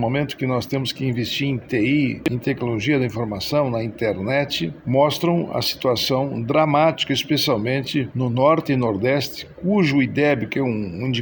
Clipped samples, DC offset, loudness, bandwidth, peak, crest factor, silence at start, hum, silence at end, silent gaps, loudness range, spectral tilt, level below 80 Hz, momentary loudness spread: under 0.1%; under 0.1%; -21 LUFS; over 20 kHz; -4 dBFS; 16 dB; 0 s; none; 0 s; none; 2 LU; -6 dB/octave; -52 dBFS; 6 LU